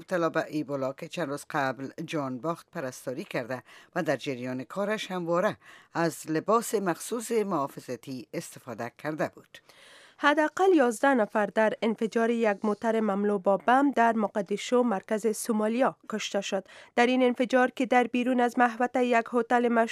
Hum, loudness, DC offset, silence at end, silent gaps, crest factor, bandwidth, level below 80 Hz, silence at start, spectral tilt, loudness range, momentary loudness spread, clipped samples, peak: none; -28 LUFS; under 0.1%; 0 s; none; 20 dB; 15.5 kHz; -80 dBFS; 0 s; -5 dB/octave; 7 LU; 12 LU; under 0.1%; -8 dBFS